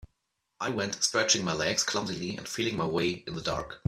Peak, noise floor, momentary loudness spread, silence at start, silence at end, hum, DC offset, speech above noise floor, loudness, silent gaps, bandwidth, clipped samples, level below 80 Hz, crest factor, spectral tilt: -8 dBFS; -80 dBFS; 9 LU; 0.6 s; 0.1 s; none; under 0.1%; 49 dB; -29 LUFS; none; 15 kHz; under 0.1%; -58 dBFS; 22 dB; -3 dB/octave